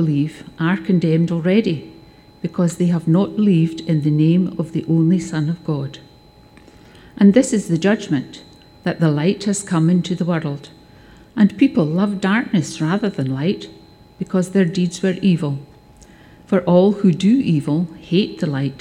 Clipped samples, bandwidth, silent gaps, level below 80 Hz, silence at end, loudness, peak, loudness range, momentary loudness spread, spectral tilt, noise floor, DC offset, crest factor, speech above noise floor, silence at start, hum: under 0.1%; 11.5 kHz; none; -54 dBFS; 0 s; -18 LUFS; 0 dBFS; 3 LU; 10 LU; -7 dB/octave; -47 dBFS; under 0.1%; 18 dB; 30 dB; 0 s; none